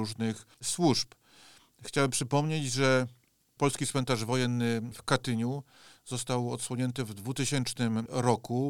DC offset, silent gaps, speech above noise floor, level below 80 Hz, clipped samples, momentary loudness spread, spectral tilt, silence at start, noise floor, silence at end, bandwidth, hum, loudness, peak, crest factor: 0.2%; none; 28 dB; -64 dBFS; under 0.1%; 9 LU; -4.5 dB/octave; 0 s; -58 dBFS; 0 s; 17.5 kHz; none; -30 LUFS; -10 dBFS; 20 dB